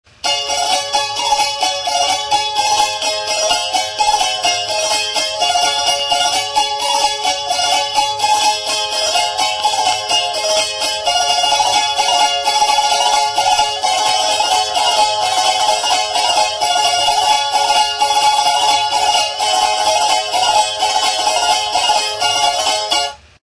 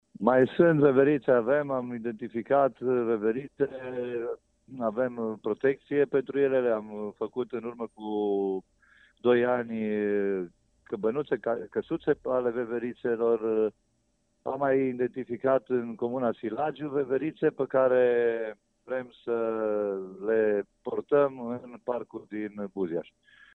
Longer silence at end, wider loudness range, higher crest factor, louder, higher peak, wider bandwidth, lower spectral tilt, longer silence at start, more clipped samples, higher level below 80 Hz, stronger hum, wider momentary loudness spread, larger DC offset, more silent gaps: second, 0.3 s vs 0.55 s; about the same, 2 LU vs 3 LU; second, 14 dB vs 22 dB; first, -14 LUFS vs -28 LUFS; first, -2 dBFS vs -6 dBFS; first, 11 kHz vs 4.2 kHz; second, 1 dB/octave vs -9 dB/octave; about the same, 0.25 s vs 0.2 s; neither; first, -50 dBFS vs -70 dBFS; neither; second, 3 LU vs 12 LU; neither; neither